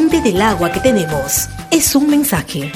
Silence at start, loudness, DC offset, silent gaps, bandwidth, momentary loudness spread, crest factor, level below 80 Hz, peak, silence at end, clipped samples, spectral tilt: 0 s; -14 LUFS; under 0.1%; none; 16.5 kHz; 5 LU; 14 dB; -34 dBFS; 0 dBFS; 0 s; under 0.1%; -4 dB/octave